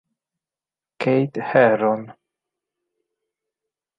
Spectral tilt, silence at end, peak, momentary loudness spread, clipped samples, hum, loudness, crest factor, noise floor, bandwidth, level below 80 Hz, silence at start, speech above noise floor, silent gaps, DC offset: -8.5 dB/octave; 1.85 s; -2 dBFS; 9 LU; under 0.1%; none; -19 LUFS; 22 dB; under -90 dBFS; 7.4 kHz; -70 dBFS; 1 s; over 72 dB; none; under 0.1%